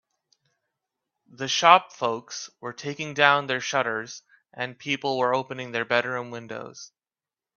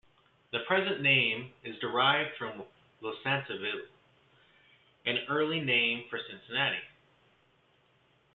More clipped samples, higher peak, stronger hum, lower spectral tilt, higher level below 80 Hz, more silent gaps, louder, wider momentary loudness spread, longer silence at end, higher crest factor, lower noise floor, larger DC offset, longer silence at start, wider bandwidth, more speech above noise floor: neither; first, 0 dBFS vs -12 dBFS; neither; second, -3 dB/octave vs -7.5 dB/octave; about the same, -74 dBFS vs -76 dBFS; neither; first, -24 LUFS vs -30 LUFS; first, 18 LU vs 15 LU; second, 0.7 s vs 1.45 s; about the same, 26 dB vs 22 dB; first, under -90 dBFS vs -68 dBFS; neither; first, 1.4 s vs 0.55 s; first, 7.2 kHz vs 4.6 kHz; first, over 65 dB vs 37 dB